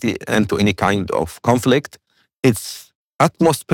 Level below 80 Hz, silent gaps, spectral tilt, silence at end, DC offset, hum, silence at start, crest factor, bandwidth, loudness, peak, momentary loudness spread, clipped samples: -50 dBFS; 2.95-3.19 s; -5.5 dB/octave; 0 s; under 0.1%; none; 0 s; 14 dB; 18 kHz; -18 LUFS; -4 dBFS; 10 LU; under 0.1%